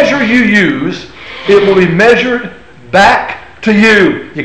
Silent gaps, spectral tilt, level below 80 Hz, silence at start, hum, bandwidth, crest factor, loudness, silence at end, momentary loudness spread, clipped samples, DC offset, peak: none; -5.5 dB/octave; -40 dBFS; 0 s; none; 9.4 kHz; 10 dB; -8 LUFS; 0 s; 14 LU; under 0.1%; 1%; 0 dBFS